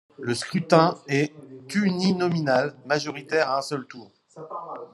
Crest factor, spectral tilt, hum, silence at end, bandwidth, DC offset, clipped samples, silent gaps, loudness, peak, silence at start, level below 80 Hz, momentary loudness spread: 22 dB; -5.5 dB/octave; none; 0.05 s; 12 kHz; under 0.1%; under 0.1%; none; -24 LUFS; -2 dBFS; 0.2 s; -70 dBFS; 18 LU